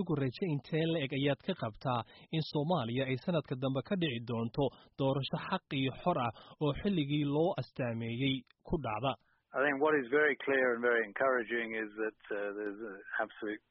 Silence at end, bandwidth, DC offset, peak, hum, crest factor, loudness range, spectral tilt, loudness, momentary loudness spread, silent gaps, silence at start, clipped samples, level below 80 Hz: 0.15 s; 5.8 kHz; under 0.1%; -18 dBFS; none; 16 dB; 3 LU; -4.5 dB/octave; -34 LUFS; 9 LU; none; 0 s; under 0.1%; -60 dBFS